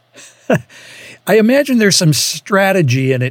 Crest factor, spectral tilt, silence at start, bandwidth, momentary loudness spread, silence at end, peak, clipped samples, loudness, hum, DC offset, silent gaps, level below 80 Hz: 14 dB; -4.5 dB/octave; 0.2 s; 17.5 kHz; 7 LU; 0 s; 0 dBFS; under 0.1%; -13 LUFS; none; under 0.1%; none; -66 dBFS